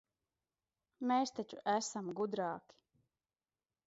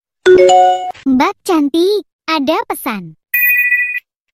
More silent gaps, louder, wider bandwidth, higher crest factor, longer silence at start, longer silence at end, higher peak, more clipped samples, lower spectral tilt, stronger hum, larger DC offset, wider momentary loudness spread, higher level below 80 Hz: second, none vs 2.13-2.19 s; second, -38 LUFS vs -12 LUFS; second, 7.6 kHz vs 16.5 kHz; first, 20 dB vs 12 dB; first, 1 s vs 0.25 s; first, 1.3 s vs 0.4 s; second, -20 dBFS vs 0 dBFS; second, under 0.1% vs 0.2%; about the same, -4 dB/octave vs -3.5 dB/octave; neither; neither; second, 7 LU vs 12 LU; second, -86 dBFS vs -52 dBFS